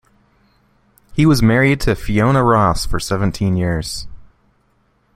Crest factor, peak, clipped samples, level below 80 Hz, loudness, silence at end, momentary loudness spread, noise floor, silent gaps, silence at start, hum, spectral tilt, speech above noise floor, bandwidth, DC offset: 16 dB; 0 dBFS; under 0.1%; -32 dBFS; -16 LUFS; 0.95 s; 12 LU; -60 dBFS; none; 1.1 s; none; -6 dB/octave; 45 dB; 16 kHz; under 0.1%